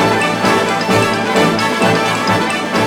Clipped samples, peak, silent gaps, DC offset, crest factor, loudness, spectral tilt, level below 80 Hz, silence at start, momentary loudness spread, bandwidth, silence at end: under 0.1%; 0 dBFS; none; under 0.1%; 14 dB; -13 LUFS; -4.5 dB/octave; -46 dBFS; 0 s; 1 LU; over 20 kHz; 0 s